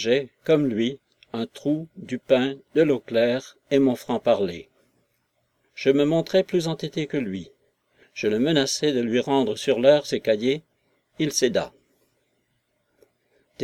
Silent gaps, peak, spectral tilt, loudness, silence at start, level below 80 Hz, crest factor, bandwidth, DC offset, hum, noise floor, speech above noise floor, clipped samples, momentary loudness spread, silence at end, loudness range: none; -4 dBFS; -5 dB/octave; -23 LUFS; 0 s; -66 dBFS; 20 dB; 15 kHz; under 0.1%; none; -72 dBFS; 49 dB; under 0.1%; 11 LU; 0 s; 3 LU